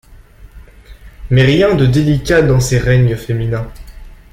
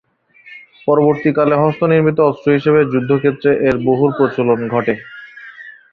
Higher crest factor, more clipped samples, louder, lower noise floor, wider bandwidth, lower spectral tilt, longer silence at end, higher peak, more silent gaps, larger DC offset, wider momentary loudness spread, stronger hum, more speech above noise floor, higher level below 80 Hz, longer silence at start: about the same, 12 dB vs 14 dB; neither; about the same, -13 LUFS vs -14 LUFS; second, -39 dBFS vs -45 dBFS; first, 15.5 kHz vs 4.9 kHz; second, -6.5 dB/octave vs -9.5 dB/octave; about the same, 0.2 s vs 0.2 s; about the same, -2 dBFS vs 0 dBFS; neither; neither; second, 9 LU vs 13 LU; neither; second, 27 dB vs 32 dB; first, -30 dBFS vs -50 dBFS; second, 0.1 s vs 0.45 s